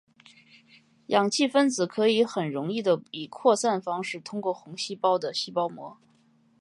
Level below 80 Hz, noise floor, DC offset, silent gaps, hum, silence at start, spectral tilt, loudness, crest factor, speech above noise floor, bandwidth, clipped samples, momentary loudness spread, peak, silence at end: -80 dBFS; -63 dBFS; under 0.1%; none; none; 1.1 s; -4 dB/octave; -26 LUFS; 20 dB; 37 dB; 11.5 kHz; under 0.1%; 10 LU; -6 dBFS; 0.7 s